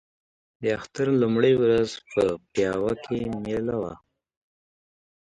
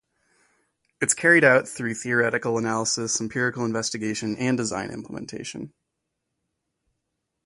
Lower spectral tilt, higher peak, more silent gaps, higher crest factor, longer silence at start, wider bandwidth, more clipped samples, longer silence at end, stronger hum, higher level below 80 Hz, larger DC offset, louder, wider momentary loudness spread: first, -6.5 dB/octave vs -3.5 dB/octave; second, -8 dBFS vs -4 dBFS; neither; about the same, 18 dB vs 22 dB; second, 0.6 s vs 1 s; about the same, 11 kHz vs 11.5 kHz; neither; second, 1.25 s vs 1.75 s; neither; first, -56 dBFS vs -64 dBFS; neither; about the same, -25 LUFS vs -23 LUFS; second, 9 LU vs 18 LU